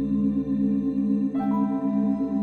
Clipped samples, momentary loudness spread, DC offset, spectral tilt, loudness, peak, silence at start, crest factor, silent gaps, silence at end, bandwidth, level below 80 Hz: under 0.1%; 1 LU; under 0.1%; -11 dB/octave; -24 LUFS; -14 dBFS; 0 s; 10 dB; none; 0 s; 4.3 kHz; -50 dBFS